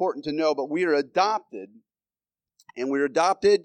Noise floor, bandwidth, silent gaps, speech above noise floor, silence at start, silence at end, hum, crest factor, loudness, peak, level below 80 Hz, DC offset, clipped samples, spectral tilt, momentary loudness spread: under -90 dBFS; 9.8 kHz; none; over 66 dB; 0 s; 0.05 s; none; 16 dB; -24 LUFS; -8 dBFS; -68 dBFS; under 0.1%; under 0.1%; -4 dB/octave; 16 LU